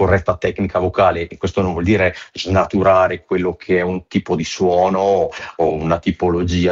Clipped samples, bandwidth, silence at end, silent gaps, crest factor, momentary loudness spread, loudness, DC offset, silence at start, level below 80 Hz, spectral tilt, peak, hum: under 0.1%; 7.8 kHz; 0 s; none; 14 dB; 6 LU; -17 LUFS; under 0.1%; 0 s; -38 dBFS; -6.5 dB/octave; -2 dBFS; none